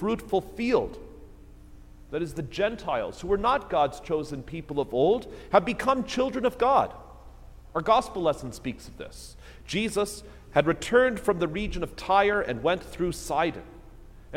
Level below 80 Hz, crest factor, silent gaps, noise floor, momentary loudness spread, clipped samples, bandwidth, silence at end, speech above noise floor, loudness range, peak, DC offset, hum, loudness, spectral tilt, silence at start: -46 dBFS; 22 dB; none; -47 dBFS; 14 LU; under 0.1%; 16.5 kHz; 0 s; 21 dB; 4 LU; -6 dBFS; under 0.1%; none; -27 LUFS; -5 dB/octave; 0 s